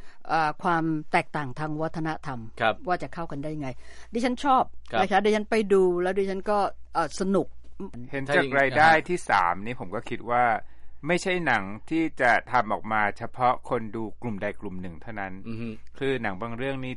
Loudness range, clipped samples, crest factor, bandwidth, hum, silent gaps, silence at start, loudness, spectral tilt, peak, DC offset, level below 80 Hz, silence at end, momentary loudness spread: 6 LU; under 0.1%; 20 dB; 11.5 kHz; none; none; 0 s; -26 LUFS; -5.5 dB/octave; -6 dBFS; under 0.1%; -50 dBFS; 0 s; 14 LU